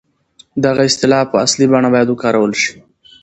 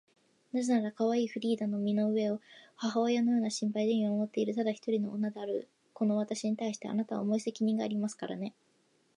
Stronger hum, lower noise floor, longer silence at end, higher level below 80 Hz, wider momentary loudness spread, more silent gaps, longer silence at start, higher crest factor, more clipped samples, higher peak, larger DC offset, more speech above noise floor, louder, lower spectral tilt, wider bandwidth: neither; second, -49 dBFS vs -71 dBFS; second, 0.5 s vs 0.65 s; first, -52 dBFS vs -84 dBFS; about the same, 6 LU vs 8 LU; neither; about the same, 0.55 s vs 0.55 s; about the same, 14 dB vs 14 dB; neither; first, 0 dBFS vs -18 dBFS; neither; about the same, 37 dB vs 39 dB; first, -13 LUFS vs -32 LUFS; second, -4 dB/octave vs -6 dB/octave; second, 8.8 kHz vs 11 kHz